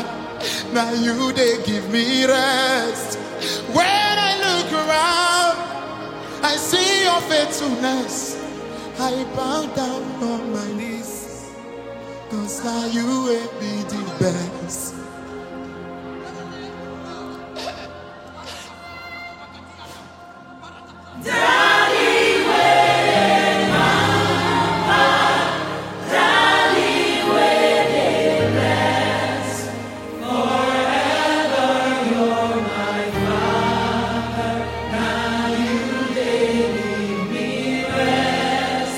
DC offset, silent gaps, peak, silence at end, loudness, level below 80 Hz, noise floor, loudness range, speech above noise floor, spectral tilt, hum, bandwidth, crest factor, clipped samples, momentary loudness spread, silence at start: under 0.1%; none; -2 dBFS; 0 s; -19 LUFS; -48 dBFS; -40 dBFS; 16 LU; 20 dB; -3.5 dB/octave; none; 16.5 kHz; 18 dB; under 0.1%; 18 LU; 0 s